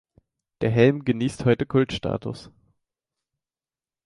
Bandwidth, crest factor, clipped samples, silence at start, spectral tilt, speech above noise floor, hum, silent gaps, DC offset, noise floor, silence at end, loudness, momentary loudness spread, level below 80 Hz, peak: 11.5 kHz; 20 dB; under 0.1%; 0.6 s; -7.5 dB/octave; over 68 dB; none; none; under 0.1%; under -90 dBFS; 1.6 s; -23 LUFS; 12 LU; -52 dBFS; -4 dBFS